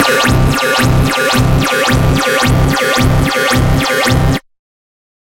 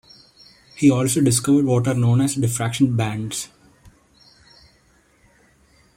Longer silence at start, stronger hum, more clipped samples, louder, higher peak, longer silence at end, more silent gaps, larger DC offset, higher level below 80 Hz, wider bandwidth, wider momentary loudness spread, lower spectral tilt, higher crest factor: second, 0 s vs 0.75 s; neither; neither; first, -11 LUFS vs -19 LUFS; first, 0 dBFS vs -4 dBFS; second, 0.8 s vs 2.5 s; neither; neither; first, -22 dBFS vs -54 dBFS; about the same, 17 kHz vs 16.5 kHz; second, 1 LU vs 10 LU; about the same, -4.5 dB/octave vs -5.5 dB/octave; second, 12 dB vs 18 dB